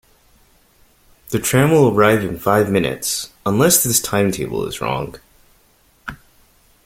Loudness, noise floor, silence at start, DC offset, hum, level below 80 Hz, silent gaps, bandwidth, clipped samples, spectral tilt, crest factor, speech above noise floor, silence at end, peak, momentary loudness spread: -16 LUFS; -55 dBFS; 1.3 s; under 0.1%; none; -46 dBFS; none; 16.5 kHz; under 0.1%; -4.5 dB/octave; 18 dB; 39 dB; 0.7 s; 0 dBFS; 16 LU